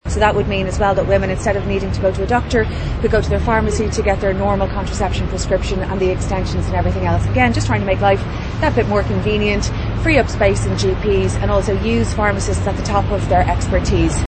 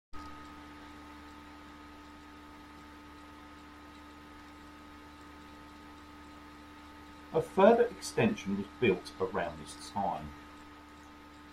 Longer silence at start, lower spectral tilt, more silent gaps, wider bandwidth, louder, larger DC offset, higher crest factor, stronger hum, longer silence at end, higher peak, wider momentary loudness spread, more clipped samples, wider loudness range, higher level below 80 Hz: about the same, 0.05 s vs 0.15 s; about the same, -6 dB/octave vs -5.5 dB/octave; neither; second, 8.8 kHz vs 15.5 kHz; first, -17 LUFS vs -31 LUFS; neither; second, 16 dB vs 26 dB; neither; about the same, 0 s vs 0 s; first, 0 dBFS vs -10 dBFS; second, 5 LU vs 20 LU; neither; second, 2 LU vs 20 LU; first, -24 dBFS vs -60 dBFS